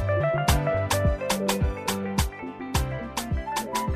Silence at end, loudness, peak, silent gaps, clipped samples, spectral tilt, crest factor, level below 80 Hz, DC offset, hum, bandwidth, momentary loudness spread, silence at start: 0 s; -26 LUFS; -6 dBFS; none; under 0.1%; -5 dB/octave; 20 dB; -32 dBFS; under 0.1%; none; 15.5 kHz; 7 LU; 0 s